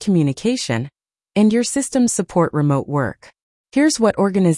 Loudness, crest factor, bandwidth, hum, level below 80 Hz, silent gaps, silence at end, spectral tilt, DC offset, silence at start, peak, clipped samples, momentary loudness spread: -18 LUFS; 14 dB; 12 kHz; none; -54 dBFS; 3.42-3.64 s; 0 s; -5.5 dB/octave; under 0.1%; 0 s; -4 dBFS; under 0.1%; 8 LU